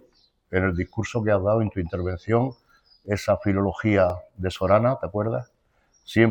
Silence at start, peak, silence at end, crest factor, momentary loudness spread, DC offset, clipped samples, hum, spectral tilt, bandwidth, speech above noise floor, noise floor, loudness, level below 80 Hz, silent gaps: 0.5 s; -4 dBFS; 0 s; 20 dB; 9 LU; under 0.1%; under 0.1%; none; -7.5 dB/octave; 18.5 kHz; 42 dB; -65 dBFS; -24 LUFS; -48 dBFS; none